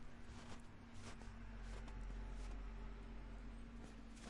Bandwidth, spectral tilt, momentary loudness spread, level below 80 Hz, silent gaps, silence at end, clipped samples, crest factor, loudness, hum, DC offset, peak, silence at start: 11 kHz; -5.5 dB/octave; 5 LU; -54 dBFS; none; 0 s; under 0.1%; 12 dB; -56 LUFS; none; under 0.1%; -40 dBFS; 0 s